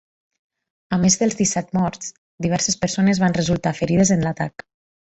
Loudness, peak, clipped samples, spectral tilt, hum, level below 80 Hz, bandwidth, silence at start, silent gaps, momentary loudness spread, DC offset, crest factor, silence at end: -20 LUFS; -4 dBFS; under 0.1%; -4.5 dB/octave; none; -48 dBFS; 8.2 kHz; 0.9 s; 2.18-2.38 s; 10 LU; under 0.1%; 18 dB; 0.55 s